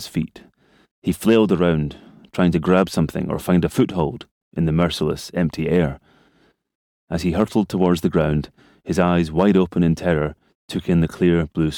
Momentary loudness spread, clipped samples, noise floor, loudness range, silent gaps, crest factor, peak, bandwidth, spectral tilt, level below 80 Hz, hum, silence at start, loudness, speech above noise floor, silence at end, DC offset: 12 LU; under 0.1%; -60 dBFS; 3 LU; 0.91-1.02 s, 4.31-4.52 s, 6.75-7.08 s, 10.55-10.68 s; 16 dB; -4 dBFS; 16.5 kHz; -7 dB/octave; -40 dBFS; none; 0 s; -20 LUFS; 41 dB; 0 s; under 0.1%